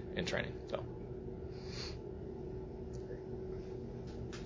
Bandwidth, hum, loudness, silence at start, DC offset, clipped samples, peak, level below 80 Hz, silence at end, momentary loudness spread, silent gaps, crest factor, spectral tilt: 7.6 kHz; none; -44 LUFS; 0 s; under 0.1%; under 0.1%; -20 dBFS; -52 dBFS; 0 s; 8 LU; none; 24 dB; -5.5 dB/octave